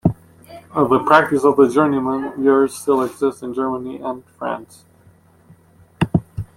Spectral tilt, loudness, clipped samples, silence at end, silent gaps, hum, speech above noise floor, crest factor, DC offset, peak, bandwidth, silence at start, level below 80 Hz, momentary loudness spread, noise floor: -7 dB/octave; -18 LUFS; under 0.1%; 0.1 s; none; none; 34 dB; 18 dB; under 0.1%; 0 dBFS; 14.5 kHz; 0.05 s; -50 dBFS; 14 LU; -51 dBFS